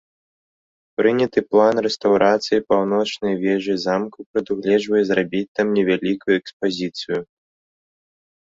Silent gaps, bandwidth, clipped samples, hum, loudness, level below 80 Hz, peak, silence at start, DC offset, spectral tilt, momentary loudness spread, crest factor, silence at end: 4.26-4.34 s, 5.48-5.55 s, 6.53-6.60 s; 7.8 kHz; under 0.1%; none; -20 LUFS; -60 dBFS; -2 dBFS; 1 s; under 0.1%; -5.5 dB/octave; 9 LU; 18 dB; 1.3 s